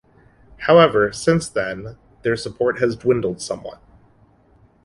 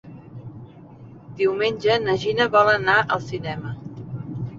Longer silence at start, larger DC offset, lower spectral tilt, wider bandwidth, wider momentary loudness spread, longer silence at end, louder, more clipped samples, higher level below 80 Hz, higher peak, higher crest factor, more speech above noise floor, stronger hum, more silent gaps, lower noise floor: first, 0.6 s vs 0.05 s; neither; about the same, -5.5 dB/octave vs -5.5 dB/octave; first, 11.5 kHz vs 7.6 kHz; second, 17 LU vs 23 LU; first, 1.1 s vs 0 s; about the same, -19 LUFS vs -21 LUFS; neither; about the same, -50 dBFS vs -54 dBFS; about the same, -2 dBFS vs -2 dBFS; about the same, 18 dB vs 20 dB; first, 36 dB vs 23 dB; neither; neither; first, -54 dBFS vs -43 dBFS